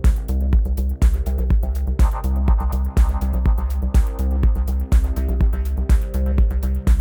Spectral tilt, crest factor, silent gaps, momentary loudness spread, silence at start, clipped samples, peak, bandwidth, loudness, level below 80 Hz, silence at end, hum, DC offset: -8 dB/octave; 12 dB; none; 3 LU; 0 s; under 0.1%; -4 dBFS; 18 kHz; -21 LUFS; -18 dBFS; 0 s; none; under 0.1%